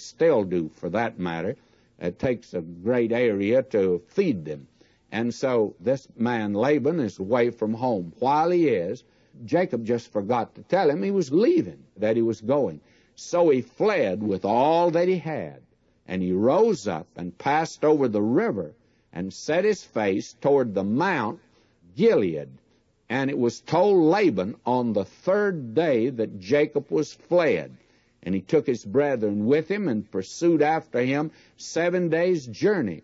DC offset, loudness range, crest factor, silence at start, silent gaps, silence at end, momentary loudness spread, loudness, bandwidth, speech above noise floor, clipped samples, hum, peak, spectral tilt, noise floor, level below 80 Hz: under 0.1%; 2 LU; 14 dB; 0 s; none; 0.05 s; 12 LU; -24 LUFS; 8 kHz; 34 dB; under 0.1%; none; -10 dBFS; -6.5 dB/octave; -57 dBFS; -64 dBFS